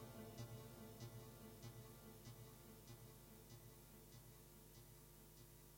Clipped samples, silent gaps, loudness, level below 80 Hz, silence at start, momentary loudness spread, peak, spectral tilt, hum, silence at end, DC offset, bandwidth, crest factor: under 0.1%; none; -60 LUFS; -72 dBFS; 0 s; 7 LU; -42 dBFS; -5 dB/octave; 50 Hz at -70 dBFS; 0 s; under 0.1%; 16.5 kHz; 18 dB